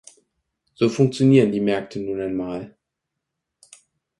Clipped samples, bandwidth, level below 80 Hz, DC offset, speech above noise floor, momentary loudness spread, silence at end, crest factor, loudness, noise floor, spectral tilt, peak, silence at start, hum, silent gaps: under 0.1%; 11.5 kHz; -60 dBFS; under 0.1%; 62 dB; 15 LU; 1.5 s; 20 dB; -20 LUFS; -82 dBFS; -7 dB/octave; -4 dBFS; 0.8 s; none; none